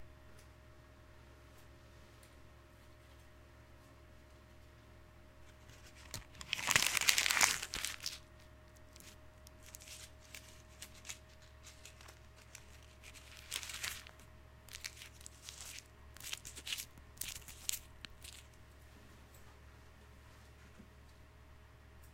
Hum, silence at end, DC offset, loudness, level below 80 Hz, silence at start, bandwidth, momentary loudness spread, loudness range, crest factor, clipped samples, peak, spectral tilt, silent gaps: none; 0 s; under 0.1%; -38 LUFS; -62 dBFS; 0 s; 17 kHz; 24 LU; 26 LU; 40 dB; under 0.1%; -6 dBFS; 0 dB/octave; none